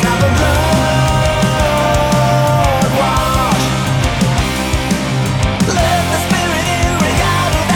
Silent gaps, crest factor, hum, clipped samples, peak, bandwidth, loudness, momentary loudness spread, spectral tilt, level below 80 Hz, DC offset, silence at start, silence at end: none; 12 dB; none; under 0.1%; -2 dBFS; 18.5 kHz; -13 LUFS; 3 LU; -5 dB/octave; -24 dBFS; under 0.1%; 0 s; 0 s